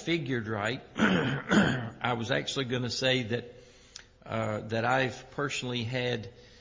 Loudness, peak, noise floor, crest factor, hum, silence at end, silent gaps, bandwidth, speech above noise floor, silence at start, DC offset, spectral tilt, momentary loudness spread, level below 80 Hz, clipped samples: -30 LUFS; -10 dBFS; -52 dBFS; 20 dB; none; 0.05 s; none; 7.6 kHz; 22 dB; 0 s; under 0.1%; -5 dB/octave; 11 LU; -58 dBFS; under 0.1%